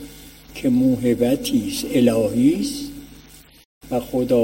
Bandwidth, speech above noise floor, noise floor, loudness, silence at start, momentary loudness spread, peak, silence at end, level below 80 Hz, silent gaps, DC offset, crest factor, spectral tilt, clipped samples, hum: 16.5 kHz; 27 dB; -46 dBFS; -20 LUFS; 0 s; 16 LU; -4 dBFS; 0 s; -46 dBFS; 3.65-3.81 s; under 0.1%; 16 dB; -5.5 dB/octave; under 0.1%; none